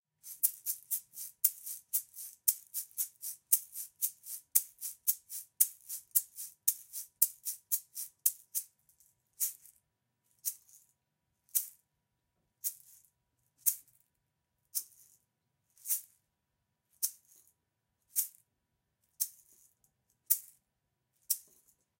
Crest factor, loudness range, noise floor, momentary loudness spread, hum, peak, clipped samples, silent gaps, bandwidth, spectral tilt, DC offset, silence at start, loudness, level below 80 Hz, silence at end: 32 dB; 9 LU; -84 dBFS; 14 LU; none; -8 dBFS; under 0.1%; none; 17 kHz; 4 dB/octave; under 0.1%; 0.25 s; -34 LUFS; -86 dBFS; 0.6 s